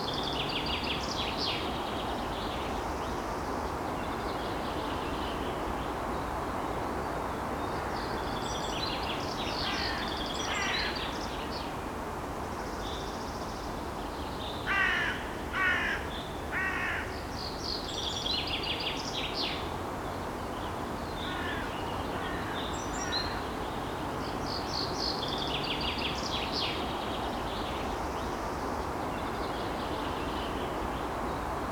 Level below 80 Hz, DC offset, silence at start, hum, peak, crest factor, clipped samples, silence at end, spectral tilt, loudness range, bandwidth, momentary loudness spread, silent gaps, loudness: -46 dBFS; under 0.1%; 0 s; none; -16 dBFS; 16 dB; under 0.1%; 0 s; -4 dB/octave; 3 LU; over 20 kHz; 6 LU; none; -33 LUFS